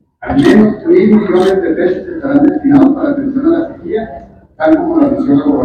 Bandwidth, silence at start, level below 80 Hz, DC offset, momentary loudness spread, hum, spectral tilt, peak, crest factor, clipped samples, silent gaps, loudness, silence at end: 9.2 kHz; 0.2 s; -40 dBFS; under 0.1%; 10 LU; none; -8 dB/octave; 0 dBFS; 10 dB; 1%; none; -11 LUFS; 0 s